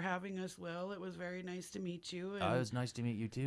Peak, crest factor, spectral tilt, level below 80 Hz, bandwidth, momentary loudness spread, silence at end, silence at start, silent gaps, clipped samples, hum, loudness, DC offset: -22 dBFS; 18 dB; -6 dB/octave; -72 dBFS; 11 kHz; 8 LU; 0 s; 0 s; none; under 0.1%; none; -41 LUFS; under 0.1%